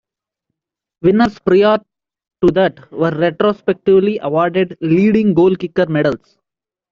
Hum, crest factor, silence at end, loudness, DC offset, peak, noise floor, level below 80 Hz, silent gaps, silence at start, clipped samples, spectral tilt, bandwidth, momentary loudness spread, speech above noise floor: none; 12 dB; 0.75 s; -15 LUFS; under 0.1%; -2 dBFS; -86 dBFS; -50 dBFS; none; 1.05 s; under 0.1%; -8.5 dB/octave; 6.8 kHz; 6 LU; 72 dB